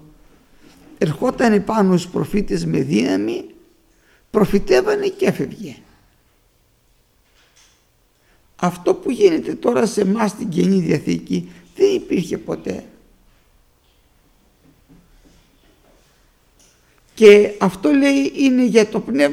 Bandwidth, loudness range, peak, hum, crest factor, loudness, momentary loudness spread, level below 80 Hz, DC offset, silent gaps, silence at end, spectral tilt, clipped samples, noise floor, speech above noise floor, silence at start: 14.5 kHz; 12 LU; 0 dBFS; none; 18 dB; -17 LUFS; 11 LU; -44 dBFS; under 0.1%; none; 0 s; -6 dB/octave; under 0.1%; -59 dBFS; 43 dB; 1 s